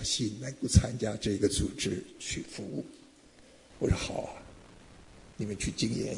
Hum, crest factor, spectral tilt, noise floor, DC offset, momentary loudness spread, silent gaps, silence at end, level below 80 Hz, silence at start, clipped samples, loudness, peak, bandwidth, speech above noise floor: none; 26 dB; -4.5 dB/octave; -57 dBFS; under 0.1%; 16 LU; none; 0 s; -44 dBFS; 0 s; under 0.1%; -32 LUFS; -8 dBFS; 11 kHz; 26 dB